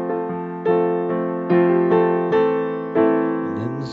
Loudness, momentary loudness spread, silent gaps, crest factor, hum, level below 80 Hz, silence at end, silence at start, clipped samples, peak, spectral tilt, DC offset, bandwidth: -20 LUFS; 8 LU; none; 14 dB; none; -68 dBFS; 0 s; 0 s; under 0.1%; -6 dBFS; -9.5 dB/octave; under 0.1%; 5 kHz